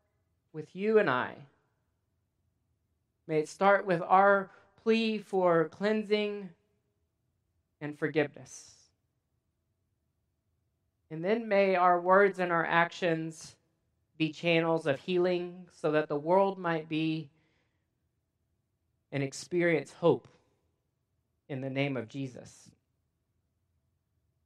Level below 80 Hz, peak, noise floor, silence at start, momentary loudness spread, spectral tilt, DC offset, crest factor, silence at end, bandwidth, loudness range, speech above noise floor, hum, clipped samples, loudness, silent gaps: -80 dBFS; -10 dBFS; -80 dBFS; 0.55 s; 18 LU; -6 dB/octave; under 0.1%; 22 dB; 1.95 s; 11.5 kHz; 11 LU; 51 dB; none; under 0.1%; -29 LUFS; none